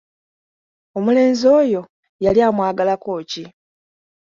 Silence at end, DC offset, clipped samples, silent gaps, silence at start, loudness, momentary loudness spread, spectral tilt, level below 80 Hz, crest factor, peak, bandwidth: 0.75 s; under 0.1%; under 0.1%; 1.89-2.03 s, 2.09-2.19 s; 0.95 s; -17 LUFS; 14 LU; -6 dB/octave; -54 dBFS; 16 dB; -2 dBFS; 7.6 kHz